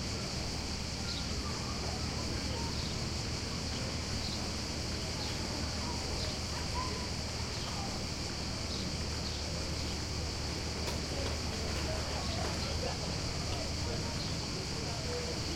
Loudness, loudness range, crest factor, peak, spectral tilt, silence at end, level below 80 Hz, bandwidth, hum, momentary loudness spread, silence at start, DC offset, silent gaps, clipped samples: -36 LUFS; 1 LU; 14 dB; -22 dBFS; -3.5 dB/octave; 0 s; -44 dBFS; 16.5 kHz; none; 1 LU; 0 s; under 0.1%; none; under 0.1%